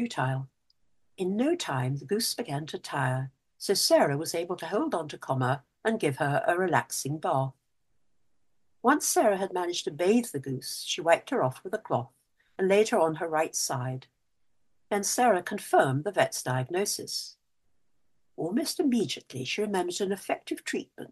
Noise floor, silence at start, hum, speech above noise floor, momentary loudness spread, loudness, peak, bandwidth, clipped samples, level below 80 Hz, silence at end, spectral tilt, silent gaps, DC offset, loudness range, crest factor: -81 dBFS; 0 s; none; 53 dB; 10 LU; -28 LUFS; -6 dBFS; 13 kHz; under 0.1%; -74 dBFS; 0.05 s; -4 dB/octave; none; under 0.1%; 4 LU; 22 dB